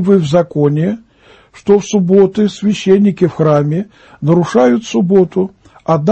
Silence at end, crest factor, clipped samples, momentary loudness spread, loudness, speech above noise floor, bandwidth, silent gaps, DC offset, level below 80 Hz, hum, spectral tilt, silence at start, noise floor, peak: 0 s; 12 dB; under 0.1%; 10 LU; -12 LUFS; 33 dB; 8.6 kHz; none; under 0.1%; -50 dBFS; none; -7.5 dB/octave; 0 s; -45 dBFS; 0 dBFS